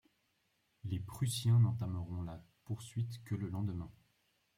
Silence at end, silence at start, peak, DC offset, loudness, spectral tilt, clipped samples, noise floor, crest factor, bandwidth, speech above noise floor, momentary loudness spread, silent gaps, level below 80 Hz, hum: 0.65 s; 0.85 s; -20 dBFS; under 0.1%; -38 LUFS; -6.5 dB/octave; under 0.1%; -79 dBFS; 18 dB; 15.5 kHz; 43 dB; 16 LU; none; -66 dBFS; none